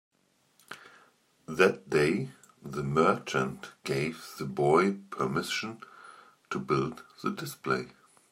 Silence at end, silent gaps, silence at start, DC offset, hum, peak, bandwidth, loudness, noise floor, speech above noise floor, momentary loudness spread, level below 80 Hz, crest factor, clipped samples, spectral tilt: 0.4 s; none; 0.7 s; under 0.1%; none; -8 dBFS; 16 kHz; -30 LUFS; -68 dBFS; 39 dB; 22 LU; -64 dBFS; 24 dB; under 0.1%; -5.5 dB/octave